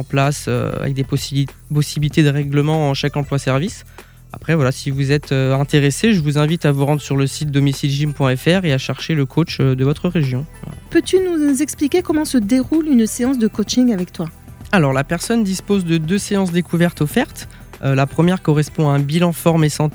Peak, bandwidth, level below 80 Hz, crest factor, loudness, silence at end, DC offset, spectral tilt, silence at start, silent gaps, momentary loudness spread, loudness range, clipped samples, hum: 0 dBFS; over 20 kHz; -42 dBFS; 16 dB; -17 LUFS; 0.05 s; under 0.1%; -6 dB/octave; 0 s; none; 6 LU; 2 LU; under 0.1%; none